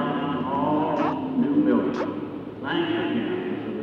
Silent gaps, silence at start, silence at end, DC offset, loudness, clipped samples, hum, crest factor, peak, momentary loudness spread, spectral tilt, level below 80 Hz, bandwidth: none; 0 s; 0 s; under 0.1%; -25 LUFS; under 0.1%; none; 14 dB; -10 dBFS; 8 LU; -8 dB/octave; -62 dBFS; 6.6 kHz